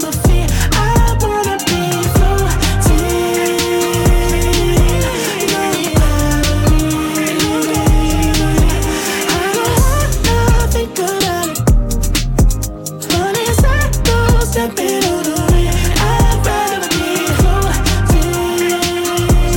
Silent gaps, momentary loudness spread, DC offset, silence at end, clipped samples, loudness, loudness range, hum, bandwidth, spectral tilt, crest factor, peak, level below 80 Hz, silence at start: none; 3 LU; under 0.1%; 0 s; under 0.1%; -14 LUFS; 1 LU; none; 18 kHz; -4.5 dB/octave; 10 dB; -2 dBFS; -16 dBFS; 0 s